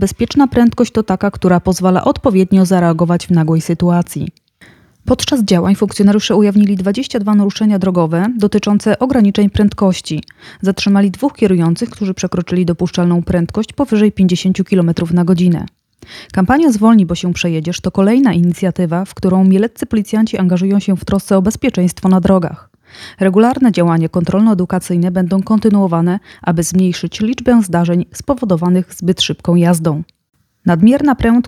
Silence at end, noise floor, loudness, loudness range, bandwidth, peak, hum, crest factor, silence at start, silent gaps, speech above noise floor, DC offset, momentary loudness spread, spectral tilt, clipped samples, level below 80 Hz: 0 s; -45 dBFS; -13 LUFS; 2 LU; 13.5 kHz; 0 dBFS; none; 12 dB; 0 s; none; 33 dB; under 0.1%; 7 LU; -6.5 dB/octave; under 0.1%; -40 dBFS